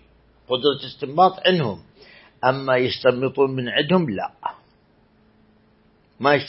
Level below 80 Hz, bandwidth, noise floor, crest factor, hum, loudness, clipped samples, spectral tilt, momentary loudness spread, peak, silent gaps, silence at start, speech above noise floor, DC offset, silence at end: -62 dBFS; 5.8 kHz; -58 dBFS; 20 dB; none; -21 LUFS; under 0.1%; -10 dB/octave; 11 LU; -2 dBFS; none; 0.5 s; 37 dB; under 0.1%; 0 s